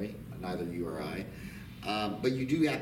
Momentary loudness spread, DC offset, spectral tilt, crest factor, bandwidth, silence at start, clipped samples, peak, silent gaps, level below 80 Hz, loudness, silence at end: 13 LU; under 0.1%; -6 dB/octave; 18 dB; 17 kHz; 0 s; under 0.1%; -16 dBFS; none; -56 dBFS; -35 LUFS; 0 s